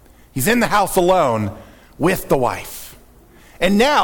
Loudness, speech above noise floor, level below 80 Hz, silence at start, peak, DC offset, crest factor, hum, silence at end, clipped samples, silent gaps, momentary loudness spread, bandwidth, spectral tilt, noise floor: -17 LUFS; 30 dB; -38 dBFS; 0.35 s; -2 dBFS; under 0.1%; 16 dB; none; 0 s; under 0.1%; none; 16 LU; 19 kHz; -4.5 dB/octave; -46 dBFS